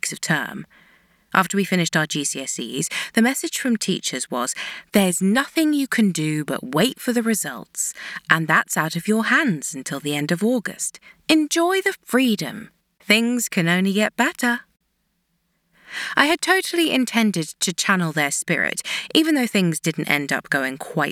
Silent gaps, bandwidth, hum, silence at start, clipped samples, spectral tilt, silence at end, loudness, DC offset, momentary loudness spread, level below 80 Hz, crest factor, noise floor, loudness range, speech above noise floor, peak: none; 18 kHz; none; 0.05 s; under 0.1%; -3.5 dB/octave; 0 s; -21 LUFS; under 0.1%; 8 LU; -66 dBFS; 20 dB; -71 dBFS; 2 LU; 49 dB; -2 dBFS